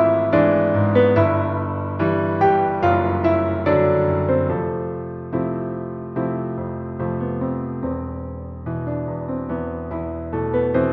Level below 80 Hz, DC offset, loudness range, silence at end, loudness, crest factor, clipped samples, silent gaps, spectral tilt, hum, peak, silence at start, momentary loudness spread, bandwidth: -44 dBFS; under 0.1%; 8 LU; 0 s; -21 LUFS; 16 dB; under 0.1%; none; -10.5 dB/octave; none; -4 dBFS; 0 s; 11 LU; 5.8 kHz